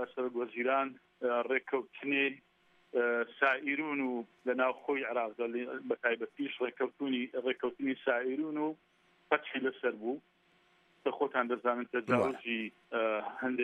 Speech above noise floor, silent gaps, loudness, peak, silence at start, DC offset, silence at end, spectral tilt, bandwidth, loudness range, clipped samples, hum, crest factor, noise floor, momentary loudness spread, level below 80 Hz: 35 dB; none; -34 LUFS; -12 dBFS; 0 s; under 0.1%; 0 s; -6.5 dB/octave; 9.2 kHz; 3 LU; under 0.1%; none; 22 dB; -69 dBFS; 7 LU; -84 dBFS